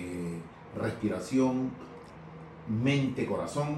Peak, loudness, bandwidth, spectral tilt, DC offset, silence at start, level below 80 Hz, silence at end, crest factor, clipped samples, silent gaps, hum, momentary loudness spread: -16 dBFS; -31 LUFS; 12.5 kHz; -6.5 dB/octave; under 0.1%; 0 s; -60 dBFS; 0 s; 16 dB; under 0.1%; none; none; 19 LU